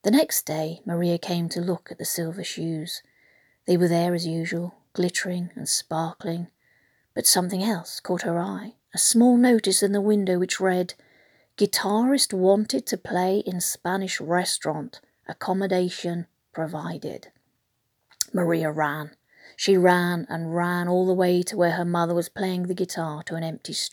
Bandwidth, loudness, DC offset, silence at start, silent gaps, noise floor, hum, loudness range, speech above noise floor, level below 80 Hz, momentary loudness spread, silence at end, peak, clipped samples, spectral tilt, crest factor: over 20 kHz; -24 LUFS; under 0.1%; 0.05 s; none; -74 dBFS; none; 7 LU; 50 dB; -74 dBFS; 14 LU; 0.05 s; -2 dBFS; under 0.1%; -4 dB/octave; 22 dB